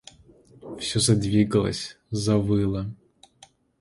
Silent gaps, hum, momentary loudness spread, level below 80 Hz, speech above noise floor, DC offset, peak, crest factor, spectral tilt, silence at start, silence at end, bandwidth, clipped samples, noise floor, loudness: none; none; 12 LU; -48 dBFS; 33 dB; under 0.1%; -8 dBFS; 18 dB; -5.5 dB/octave; 0.65 s; 0.85 s; 11.5 kHz; under 0.1%; -56 dBFS; -24 LUFS